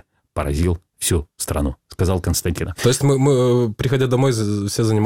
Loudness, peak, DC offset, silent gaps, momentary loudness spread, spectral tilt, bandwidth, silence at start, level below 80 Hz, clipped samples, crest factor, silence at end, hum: -19 LUFS; -4 dBFS; 0.2%; none; 8 LU; -5.5 dB/octave; 17 kHz; 0.35 s; -32 dBFS; under 0.1%; 16 dB; 0 s; none